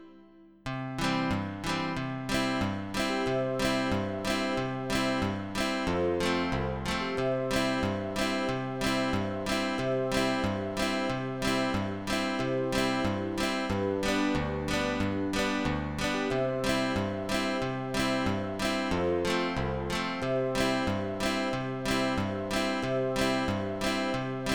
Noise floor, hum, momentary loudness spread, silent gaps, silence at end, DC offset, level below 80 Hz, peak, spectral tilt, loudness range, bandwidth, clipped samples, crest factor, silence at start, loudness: -55 dBFS; none; 3 LU; none; 0 s; 0.3%; -46 dBFS; -14 dBFS; -5 dB/octave; 1 LU; 19 kHz; under 0.1%; 16 dB; 0 s; -30 LUFS